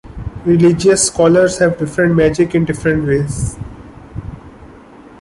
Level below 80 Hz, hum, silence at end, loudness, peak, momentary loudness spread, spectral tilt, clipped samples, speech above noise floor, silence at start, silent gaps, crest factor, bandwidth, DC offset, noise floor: -34 dBFS; none; 0.55 s; -13 LUFS; -2 dBFS; 20 LU; -5.5 dB/octave; under 0.1%; 26 dB; 0.05 s; none; 14 dB; 11.5 kHz; under 0.1%; -39 dBFS